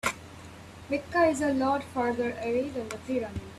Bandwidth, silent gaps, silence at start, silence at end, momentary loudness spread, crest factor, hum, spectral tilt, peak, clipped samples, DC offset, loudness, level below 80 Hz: 14 kHz; none; 0.05 s; 0 s; 21 LU; 18 dB; none; -5 dB/octave; -12 dBFS; under 0.1%; under 0.1%; -29 LUFS; -56 dBFS